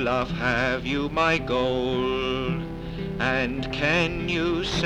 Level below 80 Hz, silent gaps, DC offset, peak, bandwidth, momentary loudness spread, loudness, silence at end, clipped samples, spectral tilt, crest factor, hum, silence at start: -40 dBFS; none; under 0.1%; -8 dBFS; 11.5 kHz; 6 LU; -25 LUFS; 0 s; under 0.1%; -5.5 dB/octave; 16 dB; none; 0 s